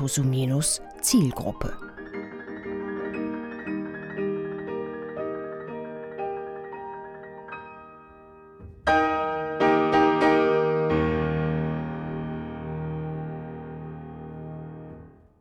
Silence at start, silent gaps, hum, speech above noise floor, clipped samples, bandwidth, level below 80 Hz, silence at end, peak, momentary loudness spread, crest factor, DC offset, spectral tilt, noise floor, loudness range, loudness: 0 s; none; none; 24 dB; under 0.1%; 18 kHz; -48 dBFS; 0.25 s; -10 dBFS; 18 LU; 18 dB; under 0.1%; -5 dB/octave; -49 dBFS; 13 LU; -27 LUFS